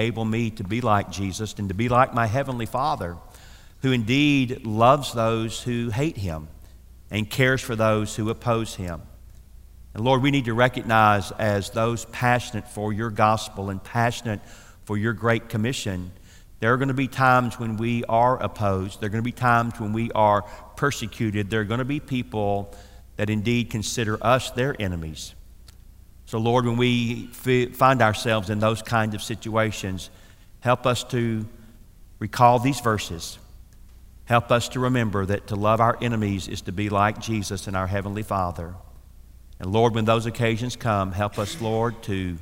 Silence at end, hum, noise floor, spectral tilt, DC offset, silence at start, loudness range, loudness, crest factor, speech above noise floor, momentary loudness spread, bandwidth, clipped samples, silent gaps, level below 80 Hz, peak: 0 s; none; -47 dBFS; -5.5 dB/octave; 0.4%; 0 s; 4 LU; -23 LUFS; 20 dB; 24 dB; 12 LU; 16 kHz; under 0.1%; none; -48 dBFS; -2 dBFS